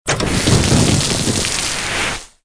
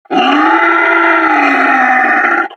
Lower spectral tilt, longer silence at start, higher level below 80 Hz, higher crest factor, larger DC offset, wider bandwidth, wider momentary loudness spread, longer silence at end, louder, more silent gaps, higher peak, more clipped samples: about the same, -3.5 dB/octave vs -3.5 dB/octave; about the same, 0.05 s vs 0.1 s; first, -30 dBFS vs -64 dBFS; first, 16 dB vs 10 dB; neither; about the same, 11 kHz vs 11 kHz; first, 6 LU vs 1 LU; first, 0.2 s vs 0 s; second, -15 LUFS vs -9 LUFS; neither; about the same, 0 dBFS vs 0 dBFS; neither